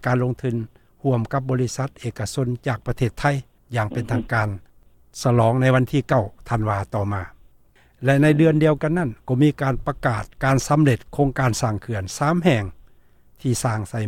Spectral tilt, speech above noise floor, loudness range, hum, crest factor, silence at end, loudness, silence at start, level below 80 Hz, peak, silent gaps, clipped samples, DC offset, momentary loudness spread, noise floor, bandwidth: -6.5 dB/octave; 34 dB; 5 LU; none; 20 dB; 0 s; -22 LUFS; 0 s; -44 dBFS; -2 dBFS; none; under 0.1%; under 0.1%; 11 LU; -54 dBFS; 15.5 kHz